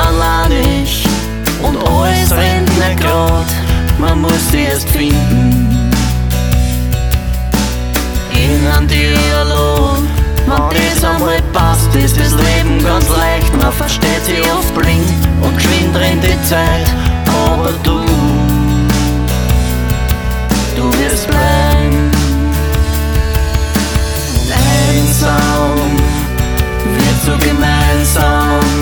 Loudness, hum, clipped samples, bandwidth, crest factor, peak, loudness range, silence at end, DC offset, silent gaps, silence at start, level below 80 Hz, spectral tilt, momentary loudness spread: -12 LUFS; none; under 0.1%; 19.5 kHz; 10 dB; 0 dBFS; 2 LU; 0 s; under 0.1%; none; 0 s; -16 dBFS; -5 dB/octave; 4 LU